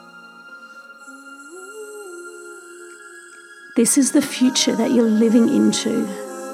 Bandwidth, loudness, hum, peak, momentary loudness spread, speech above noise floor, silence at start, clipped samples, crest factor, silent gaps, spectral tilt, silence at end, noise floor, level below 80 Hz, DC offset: 16 kHz; -17 LUFS; none; -2 dBFS; 25 LU; 26 dB; 0.15 s; under 0.1%; 18 dB; none; -3.5 dB/octave; 0 s; -42 dBFS; -76 dBFS; under 0.1%